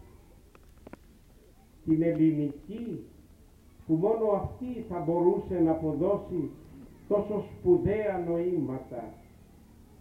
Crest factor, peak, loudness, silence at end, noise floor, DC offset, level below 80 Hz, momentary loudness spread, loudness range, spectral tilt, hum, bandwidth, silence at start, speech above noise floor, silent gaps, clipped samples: 18 dB; -12 dBFS; -29 LUFS; 0.8 s; -56 dBFS; under 0.1%; -54 dBFS; 16 LU; 3 LU; -10 dB/octave; none; 3.9 kHz; 1.85 s; 28 dB; none; under 0.1%